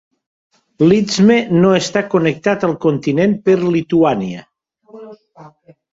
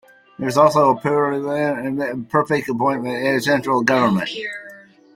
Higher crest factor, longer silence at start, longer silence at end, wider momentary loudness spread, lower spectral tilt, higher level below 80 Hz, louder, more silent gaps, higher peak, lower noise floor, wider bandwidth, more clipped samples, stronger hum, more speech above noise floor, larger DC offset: about the same, 14 dB vs 18 dB; first, 0.8 s vs 0.4 s; about the same, 0.45 s vs 0.35 s; second, 5 LU vs 10 LU; about the same, -6 dB/octave vs -5.5 dB/octave; first, -54 dBFS vs -60 dBFS; first, -14 LUFS vs -19 LUFS; neither; about the same, 0 dBFS vs 0 dBFS; about the same, -43 dBFS vs -43 dBFS; second, 7.8 kHz vs 16.5 kHz; neither; neither; first, 29 dB vs 25 dB; neither